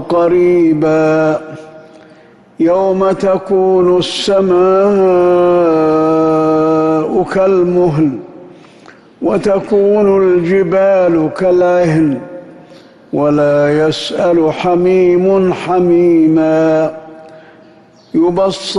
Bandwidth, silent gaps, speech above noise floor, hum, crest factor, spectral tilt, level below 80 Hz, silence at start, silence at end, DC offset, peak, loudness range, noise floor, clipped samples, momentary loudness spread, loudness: 11 kHz; none; 32 dB; none; 8 dB; -7 dB/octave; -48 dBFS; 0 s; 0 s; under 0.1%; -2 dBFS; 3 LU; -42 dBFS; under 0.1%; 6 LU; -11 LUFS